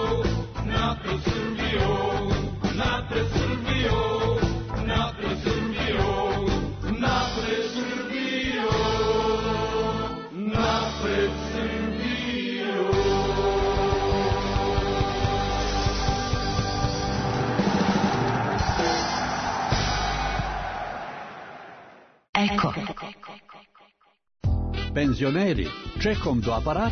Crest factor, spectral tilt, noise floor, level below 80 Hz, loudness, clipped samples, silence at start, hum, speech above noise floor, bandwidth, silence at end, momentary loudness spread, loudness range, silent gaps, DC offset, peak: 18 dB; -5.5 dB/octave; -60 dBFS; -36 dBFS; -25 LUFS; under 0.1%; 0 s; none; 36 dB; 6.6 kHz; 0 s; 6 LU; 4 LU; 22.29-22.33 s; under 0.1%; -8 dBFS